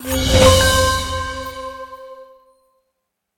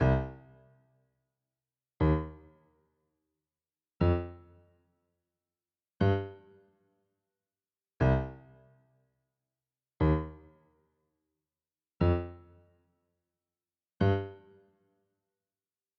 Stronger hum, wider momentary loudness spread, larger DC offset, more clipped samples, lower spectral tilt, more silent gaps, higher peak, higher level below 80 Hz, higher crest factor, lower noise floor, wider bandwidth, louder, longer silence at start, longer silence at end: neither; first, 23 LU vs 16 LU; neither; neither; second, -3.5 dB/octave vs -9.5 dB/octave; neither; first, 0 dBFS vs -14 dBFS; first, -28 dBFS vs -46 dBFS; about the same, 18 dB vs 22 dB; second, -75 dBFS vs under -90 dBFS; first, 17 kHz vs 6.2 kHz; first, -14 LUFS vs -31 LUFS; about the same, 0 s vs 0 s; second, 1.15 s vs 1.65 s